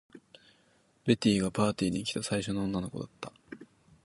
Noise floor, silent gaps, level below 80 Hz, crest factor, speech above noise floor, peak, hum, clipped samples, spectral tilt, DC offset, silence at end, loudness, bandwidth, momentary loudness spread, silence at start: -67 dBFS; none; -58 dBFS; 22 dB; 37 dB; -10 dBFS; none; under 0.1%; -5.5 dB/octave; under 0.1%; 0.4 s; -31 LUFS; 11.5 kHz; 20 LU; 0.15 s